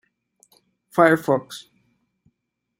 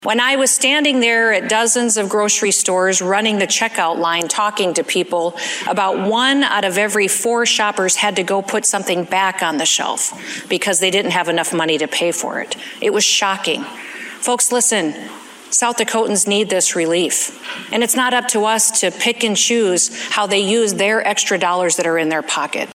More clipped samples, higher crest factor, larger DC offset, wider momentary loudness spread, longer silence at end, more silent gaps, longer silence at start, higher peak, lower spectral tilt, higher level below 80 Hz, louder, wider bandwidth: neither; first, 24 dB vs 16 dB; neither; first, 22 LU vs 7 LU; first, 1.2 s vs 0 s; neither; first, 0.95 s vs 0 s; about the same, -2 dBFS vs 0 dBFS; first, -6 dB/octave vs -1.5 dB/octave; about the same, -70 dBFS vs -70 dBFS; second, -19 LUFS vs -15 LUFS; about the same, 16 kHz vs 16 kHz